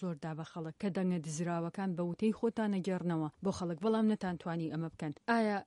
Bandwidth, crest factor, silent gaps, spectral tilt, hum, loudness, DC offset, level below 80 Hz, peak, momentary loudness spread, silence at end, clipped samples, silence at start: 11.5 kHz; 18 dB; none; -6.5 dB/octave; none; -36 LUFS; under 0.1%; -70 dBFS; -18 dBFS; 9 LU; 0 s; under 0.1%; 0 s